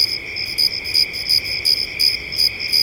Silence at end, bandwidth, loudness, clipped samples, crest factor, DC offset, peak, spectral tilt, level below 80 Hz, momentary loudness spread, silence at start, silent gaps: 0 s; 17 kHz; -16 LUFS; under 0.1%; 14 dB; under 0.1%; -4 dBFS; 0 dB/octave; -46 dBFS; 3 LU; 0 s; none